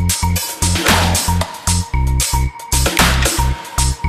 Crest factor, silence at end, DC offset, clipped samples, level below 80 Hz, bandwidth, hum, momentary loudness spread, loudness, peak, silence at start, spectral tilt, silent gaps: 16 dB; 0 s; under 0.1%; under 0.1%; -20 dBFS; 15 kHz; none; 6 LU; -15 LUFS; 0 dBFS; 0 s; -3 dB/octave; none